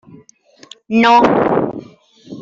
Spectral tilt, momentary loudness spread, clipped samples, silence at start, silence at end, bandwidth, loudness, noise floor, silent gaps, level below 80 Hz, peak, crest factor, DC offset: -6 dB/octave; 14 LU; under 0.1%; 0.9 s; 0 s; 7.6 kHz; -13 LUFS; -47 dBFS; none; -52 dBFS; -2 dBFS; 14 dB; under 0.1%